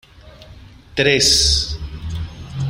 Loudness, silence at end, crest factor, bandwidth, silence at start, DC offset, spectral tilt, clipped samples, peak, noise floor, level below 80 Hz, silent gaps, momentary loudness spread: -14 LUFS; 0 s; 20 dB; 16 kHz; 0.25 s; under 0.1%; -2.5 dB/octave; under 0.1%; 0 dBFS; -42 dBFS; -32 dBFS; none; 17 LU